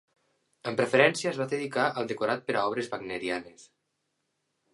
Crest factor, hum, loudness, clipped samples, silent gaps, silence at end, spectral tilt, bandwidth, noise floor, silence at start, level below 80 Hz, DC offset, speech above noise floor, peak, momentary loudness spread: 26 dB; none; -28 LUFS; under 0.1%; none; 1.1 s; -4.5 dB/octave; 11.5 kHz; -79 dBFS; 0.65 s; -72 dBFS; under 0.1%; 51 dB; -4 dBFS; 11 LU